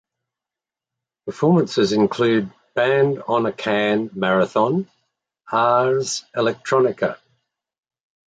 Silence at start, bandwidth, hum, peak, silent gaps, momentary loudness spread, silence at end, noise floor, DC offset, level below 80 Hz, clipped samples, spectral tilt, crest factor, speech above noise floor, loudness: 1.25 s; 9.2 kHz; none; -4 dBFS; none; 8 LU; 1.15 s; -88 dBFS; under 0.1%; -62 dBFS; under 0.1%; -5.5 dB/octave; 16 dB; 70 dB; -20 LUFS